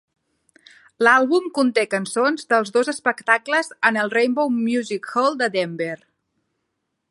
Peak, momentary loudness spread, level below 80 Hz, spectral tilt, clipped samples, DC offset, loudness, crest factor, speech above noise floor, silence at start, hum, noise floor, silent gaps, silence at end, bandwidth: 0 dBFS; 8 LU; -76 dBFS; -4 dB/octave; under 0.1%; under 0.1%; -20 LUFS; 20 dB; 56 dB; 1 s; none; -76 dBFS; none; 1.15 s; 11.5 kHz